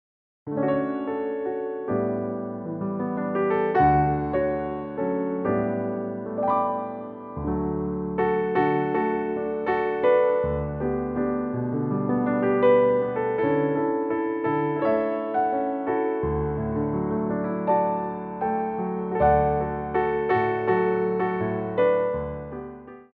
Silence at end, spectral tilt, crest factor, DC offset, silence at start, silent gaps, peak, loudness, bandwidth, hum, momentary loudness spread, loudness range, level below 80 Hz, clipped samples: 0.1 s; -7 dB/octave; 16 dB; under 0.1%; 0.45 s; none; -8 dBFS; -25 LUFS; 4.8 kHz; none; 10 LU; 4 LU; -46 dBFS; under 0.1%